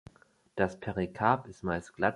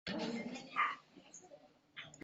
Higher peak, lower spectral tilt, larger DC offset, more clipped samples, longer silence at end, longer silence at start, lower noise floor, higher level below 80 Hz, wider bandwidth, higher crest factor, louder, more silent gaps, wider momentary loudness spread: first, -10 dBFS vs -22 dBFS; first, -7 dB/octave vs -2 dB/octave; neither; neither; about the same, 0 s vs 0 s; first, 0.55 s vs 0.05 s; about the same, -60 dBFS vs -63 dBFS; first, -56 dBFS vs -78 dBFS; first, 11.5 kHz vs 8 kHz; about the same, 24 dB vs 22 dB; first, -32 LUFS vs -40 LUFS; neither; second, 7 LU vs 21 LU